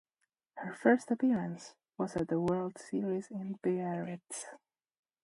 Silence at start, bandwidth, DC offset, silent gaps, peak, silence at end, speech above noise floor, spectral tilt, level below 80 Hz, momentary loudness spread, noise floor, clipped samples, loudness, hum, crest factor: 0.55 s; 11.5 kHz; under 0.1%; none; -12 dBFS; 0.65 s; 51 dB; -6.5 dB/octave; -70 dBFS; 16 LU; -85 dBFS; under 0.1%; -34 LUFS; none; 22 dB